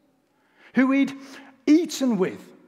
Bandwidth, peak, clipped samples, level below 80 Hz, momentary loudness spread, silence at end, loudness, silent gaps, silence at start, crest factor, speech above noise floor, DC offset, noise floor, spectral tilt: 14.5 kHz; -6 dBFS; under 0.1%; -80 dBFS; 12 LU; 0.25 s; -23 LUFS; none; 0.75 s; 18 dB; 43 dB; under 0.1%; -65 dBFS; -5 dB/octave